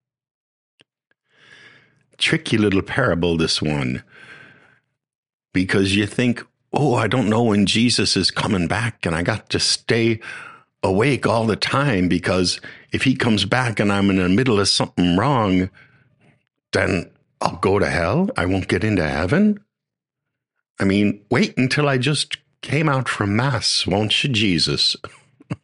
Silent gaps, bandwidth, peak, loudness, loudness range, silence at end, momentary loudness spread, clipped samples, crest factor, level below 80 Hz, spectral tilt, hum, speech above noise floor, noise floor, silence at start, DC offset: 5.15-5.23 s, 5.34-5.39 s, 20.70-20.75 s; 11.5 kHz; 0 dBFS; -19 LUFS; 4 LU; 0.1 s; 8 LU; under 0.1%; 20 dB; -46 dBFS; -5 dB/octave; none; 66 dB; -85 dBFS; 2.2 s; under 0.1%